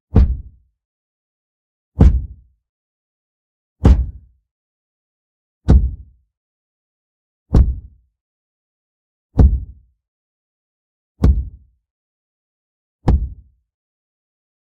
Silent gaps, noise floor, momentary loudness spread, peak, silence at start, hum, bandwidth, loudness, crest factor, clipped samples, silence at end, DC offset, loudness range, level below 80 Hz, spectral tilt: 0.85-1.92 s, 2.69-3.76 s, 4.51-5.61 s, 6.37-7.46 s, 8.21-9.30 s, 10.08-11.15 s, 11.90-12.99 s; -36 dBFS; 18 LU; 0 dBFS; 0.15 s; none; 5.4 kHz; -17 LUFS; 20 dB; under 0.1%; 1.45 s; under 0.1%; 5 LU; -22 dBFS; -10 dB/octave